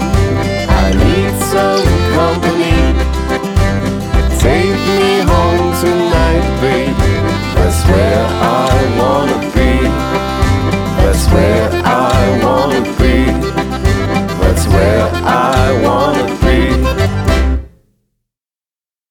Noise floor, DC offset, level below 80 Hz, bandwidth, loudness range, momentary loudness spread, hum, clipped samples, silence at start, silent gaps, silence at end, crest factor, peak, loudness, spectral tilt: under -90 dBFS; under 0.1%; -18 dBFS; 17.5 kHz; 1 LU; 4 LU; none; under 0.1%; 0 s; none; 1.45 s; 12 dB; 0 dBFS; -12 LUFS; -6 dB/octave